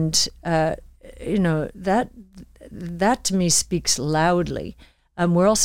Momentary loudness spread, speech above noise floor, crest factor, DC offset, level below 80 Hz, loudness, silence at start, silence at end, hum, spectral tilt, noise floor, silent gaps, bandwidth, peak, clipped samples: 16 LU; 23 dB; 16 dB; under 0.1%; -44 dBFS; -21 LUFS; 0 s; 0 s; none; -4 dB/octave; -44 dBFS; none; 16.5 kHz; -6 dBFS; under 0.1%